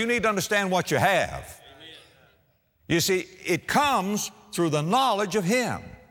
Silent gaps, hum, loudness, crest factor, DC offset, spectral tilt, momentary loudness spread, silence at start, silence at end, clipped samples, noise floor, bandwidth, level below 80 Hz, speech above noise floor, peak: none; none; -24 LUFS; 18 dB; under 0.1%; -4 dB/octave; 14 LU; 0 s; 0.2 s; under 0.1%; -66 dBFS; over 20 kHz; -56 dBFS; 41 dB; -8 dBFS